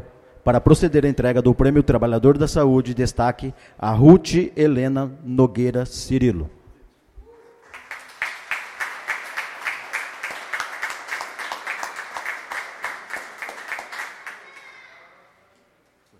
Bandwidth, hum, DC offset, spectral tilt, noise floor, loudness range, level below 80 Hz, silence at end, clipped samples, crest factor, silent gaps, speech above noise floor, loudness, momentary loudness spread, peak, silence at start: 15 kHz; none; under 0.1%; -7 dB/octave; -62 dBFS; 14 LU; -38 dBFS; 1.6 s; under 0.1%; 20 dB; none; 45 dB; -20 LUFS; 16 LU; 0 dBFS; 0.45 s